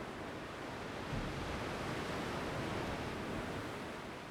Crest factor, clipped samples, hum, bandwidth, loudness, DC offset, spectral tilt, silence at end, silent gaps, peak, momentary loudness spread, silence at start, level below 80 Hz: 14 dB; under 0.1%; none; over 20 kHz; -42 LUFS; under 0.1%; -5 dB/octave; 0 s; none; -28 dBFS; 5 LU; 0 s; -54 dBFS